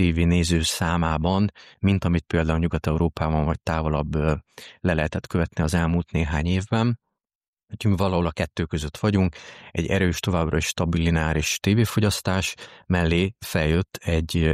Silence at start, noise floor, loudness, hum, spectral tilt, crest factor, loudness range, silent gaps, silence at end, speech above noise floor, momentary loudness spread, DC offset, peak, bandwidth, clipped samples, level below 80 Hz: 0 s; under -90 dBFS; -24 LUFS; none; -5.5 dB/octave; 16 dB; 2 LU; 7.35-7.41 s, 7.48-7.57 s; 0 s; over 67 dB; 6 LU; under 0.1%; -8 dBFS; 15 kHz; under 0.1%; -34 dBFS